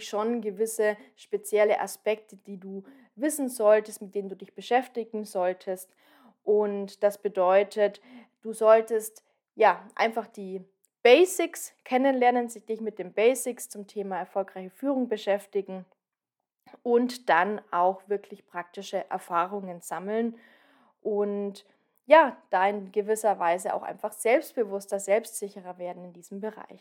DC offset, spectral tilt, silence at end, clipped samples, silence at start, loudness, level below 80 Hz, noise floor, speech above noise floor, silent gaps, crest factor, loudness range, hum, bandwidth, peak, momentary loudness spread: under 0.1%; -4 dB/octave; 0.2 s; under 0.1%; 0 s; -27 LUFS; under -90 dBFS; -88 dBFS; 61 dB; none; 24 dB; 6 LU; none; 17.5 kHz; -4 dBFS; 16 LU